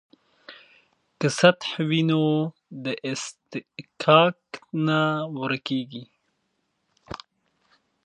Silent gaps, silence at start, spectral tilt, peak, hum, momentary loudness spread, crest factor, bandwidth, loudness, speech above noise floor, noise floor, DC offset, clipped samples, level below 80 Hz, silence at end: none; 0.5 s; -5.5 dB/octave; 0 dBFS; none; 22 LU; 24 dB; 11 kHz; -23 LUFS; 51 dB; -74 dBFS; under 0.1%; under 0.1%; -66 dBFS; 0.9 s